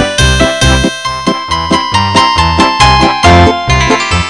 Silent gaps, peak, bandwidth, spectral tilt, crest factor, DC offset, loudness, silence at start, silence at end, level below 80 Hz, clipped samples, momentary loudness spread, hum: none; 0 dBFS; 11 kHz; -4 dB/octave; 8 dB; 0.5%; -8 LUFS; 0 s; 0 s; -18 dBFS; 2%; 7 LU; none